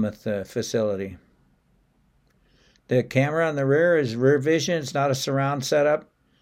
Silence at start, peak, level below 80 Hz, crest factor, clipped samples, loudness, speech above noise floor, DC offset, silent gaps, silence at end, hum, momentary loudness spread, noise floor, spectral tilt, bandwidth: 0 s; -6 dBFS; -64 dBFS; 18 dB; under 0.1%; -23 LUFS; 41 dB; under 0.1%; none; 0.4 s; none; 8 LU; -64 dBFS; -5.5 dB/octave; 16 kHz